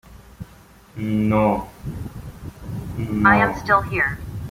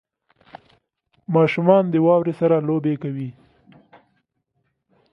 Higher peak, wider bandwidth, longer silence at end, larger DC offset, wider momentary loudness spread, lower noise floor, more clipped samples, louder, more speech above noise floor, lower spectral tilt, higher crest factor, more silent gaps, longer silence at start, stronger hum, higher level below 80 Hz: about the same, -2 dBFS vs -2 dBFS; first, 16 kHz vs 6 kHz; second, 0 s vs 1.8 s; neither; first, 24 LU vs 14 LU; second, -48 dBFS vs -72 dBFS; neither; about the same, -20 LUFS vs -19 LUFS; second, 28 dB vs 54 dB; second, -7.5 dB/octave vs -9.5 dB/octave; about the same, 20 dB vs 20 dB; neither; second, 0.1 s vs 1.3 s; neither; first, -40 dBFS vs -68 dBFS